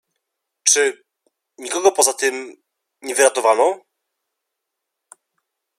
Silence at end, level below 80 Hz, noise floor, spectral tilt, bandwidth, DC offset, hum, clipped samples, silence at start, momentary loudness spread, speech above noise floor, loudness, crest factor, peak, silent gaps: 2 s; -78 dBFS; -80 dBFS; 1 dB/octave; 16 kHz; under 0.1%; none; under 0.1%; 0.65 s; 18 LU; 63 dB; -17 LUFS; 22 dB; 0 dBFS; none